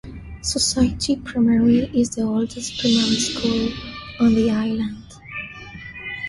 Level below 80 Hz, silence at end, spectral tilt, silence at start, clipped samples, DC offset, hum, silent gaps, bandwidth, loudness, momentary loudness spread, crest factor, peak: -40 dBFS; 0 s; -4 dB/octave; 0.05 s; under 0.1%; under 0.1%; none; none; 11.5 kHz; -20 LUFS; 16 LU; 16 dB; -6 dBFS